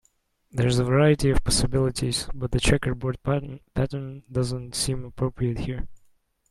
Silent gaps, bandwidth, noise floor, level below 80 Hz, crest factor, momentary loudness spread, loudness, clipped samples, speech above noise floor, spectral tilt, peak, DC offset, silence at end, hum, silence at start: none; 13 kHz; -67 dBFS; -36 dBFS; 18 dB; 12 LU; -25 LUFS; under 0.1%; 44 dB; -5 dB/octave; -6 dBFS; under 0.1%; 0.55 s; none; 0.55 s